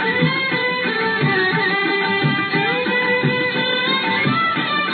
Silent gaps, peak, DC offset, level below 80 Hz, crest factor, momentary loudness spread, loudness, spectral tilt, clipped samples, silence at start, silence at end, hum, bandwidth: none; -4 dBFS; under 0.1%; -62 dBFS; 14 dB; 2 LU; -17 LUFS; -8.5 dB/octave; under 0.1%; 0 s; 0 s; none; 4.6 kHz